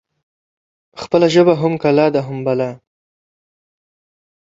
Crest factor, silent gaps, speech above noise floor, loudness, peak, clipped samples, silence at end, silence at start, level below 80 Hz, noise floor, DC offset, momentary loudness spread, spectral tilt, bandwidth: 18 dB; none; over 76 dB; -15 LUFS; -2 dBFS; under 0.1%; 1.75 s; 0.95 s; -58 dBFS; under -90 dBFS; under 0.1%; 10 LU; -6.5 dB/octave; 7.8 kHz